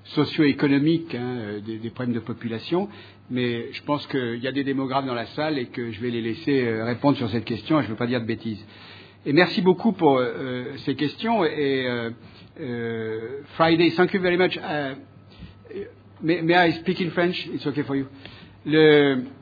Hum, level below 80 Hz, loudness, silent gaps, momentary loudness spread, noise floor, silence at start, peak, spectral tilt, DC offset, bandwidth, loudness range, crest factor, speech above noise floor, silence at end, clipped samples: none; -62 dBFS; -23 LUFS; none; 15 LU; -45 dBFS; 0.05 s; -2 dBFS; -8.5 dB/octave; under 0.1%; 5 kHz; 5 LU; 22 dB; 21 dB; 0.05 s; under 0.1%